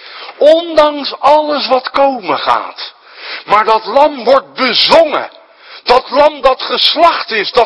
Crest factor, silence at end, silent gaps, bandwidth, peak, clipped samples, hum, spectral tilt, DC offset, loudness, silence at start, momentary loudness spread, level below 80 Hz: 12 dB; 0 s; none; 11 kHz; 0 dBFS; 1%; none; -3.5 dB/octave; under 0.1%; -10 LUFS; 0 s; 16 LU; -46 dBFS